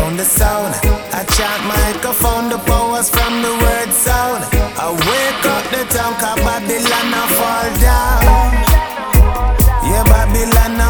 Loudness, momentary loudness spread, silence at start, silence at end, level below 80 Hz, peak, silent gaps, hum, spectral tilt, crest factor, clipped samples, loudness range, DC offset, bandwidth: -14 LUFS; 4 LU; 0 s; 0 s; -16 dBFS; 0 dBFS; none; none; -4 dB/octave; 12 dB; under 0.1%; 2 LU; under 0.1%; over 20 kHz